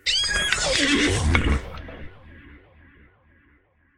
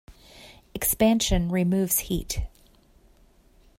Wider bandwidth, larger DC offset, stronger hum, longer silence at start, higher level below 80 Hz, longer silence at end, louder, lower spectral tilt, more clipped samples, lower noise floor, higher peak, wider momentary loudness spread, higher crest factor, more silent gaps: second, 13 kHz vs 16.5 kHz; neither; neither; about the same, 0.05 s vs 0.1 s; first, -32 dBFS vs -38 dBFS; about the same, 1.4 s vs 1.3 s; first, -21 LUFS vs -24 LUFS; second, -3 dB/octave vs -4.5 dB/octave; neither; first, -61 dBFS vs -57 dBFS; first, 0 dBFS vs -8 dBFS; first, 20 LU vs 12 LU; first, 24 dB vs 18 dB; neither